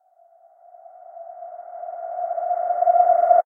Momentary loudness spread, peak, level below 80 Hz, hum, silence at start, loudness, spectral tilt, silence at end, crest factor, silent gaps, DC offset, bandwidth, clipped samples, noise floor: 23 LU; -4 dBFS; under -90 dBFS; none; 1.1 s; -20 LUFS; -5.5 dB/octave; 0.05 s; 18 dB; none; under 0.1%; 2.3 kHz; under 0.1%; -55 dBFS